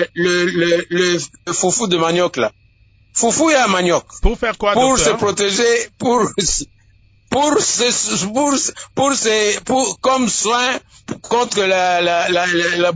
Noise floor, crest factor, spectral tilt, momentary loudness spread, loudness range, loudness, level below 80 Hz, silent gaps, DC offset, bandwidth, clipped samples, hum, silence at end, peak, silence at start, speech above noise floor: -52 dBFS; 16 dB; -2.5 dB/octave; 7 LU; 1 LU; -16 LUFS; -34 dBFS; none; under 0.1%; 8 kHz; under 0.1%; none; 0 s; -2 dBFS; 0 s; 36 dB